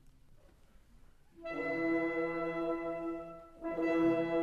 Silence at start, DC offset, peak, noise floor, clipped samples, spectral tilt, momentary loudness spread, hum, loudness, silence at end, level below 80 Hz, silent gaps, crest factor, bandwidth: 0.3 s; under 0.1%; -22 dBFS; -61 dBFS; under 0.1%; -7.5 dB/octave; 14 LU; none; -35 LUFS; 0 s; -62 dBFS; none; 16 dB; 7 kHz